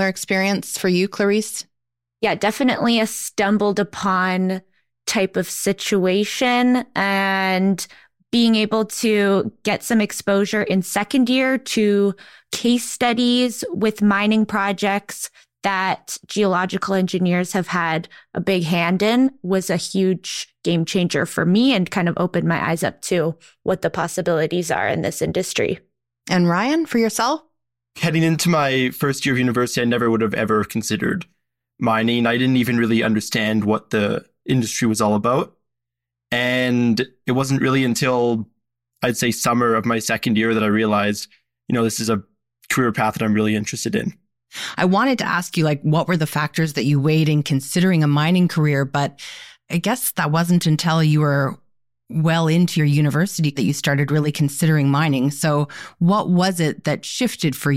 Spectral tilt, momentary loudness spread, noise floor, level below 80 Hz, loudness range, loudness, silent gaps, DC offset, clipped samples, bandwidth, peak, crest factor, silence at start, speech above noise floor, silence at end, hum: -5 dB/octave; 7 LU; -84 dBFS; -56 dBFS; 2 LU; -19 LUFS; none; under 0.1%; under 0.1%; 16.5 kHz; -4 dBFS; 16 dB; 0 s; 65 dB; 0 s; none